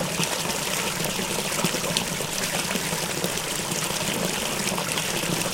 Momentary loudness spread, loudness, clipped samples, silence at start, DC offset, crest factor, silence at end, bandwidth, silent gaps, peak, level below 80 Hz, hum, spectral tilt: 2 LU; -25 LUFS; under 0.1%; 0 s; under 0.1%; 24 dB; 0 s; 17 kHz; none; -2 dBFS; -50 dBFS; none; -2.5 dB/octave